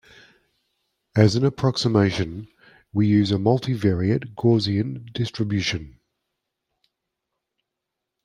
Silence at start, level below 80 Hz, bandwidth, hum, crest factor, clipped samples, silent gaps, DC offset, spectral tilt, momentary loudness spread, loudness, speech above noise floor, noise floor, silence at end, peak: 1.15 s; -54 dBFS; 10 kHz; none; 22 dB; under 0.1%; none; under 0.1%; -6.5 dB/octave; 10 LU; -22 LUFS; 62 dB; -83 dBFS; 2.35 s; -2 dBFS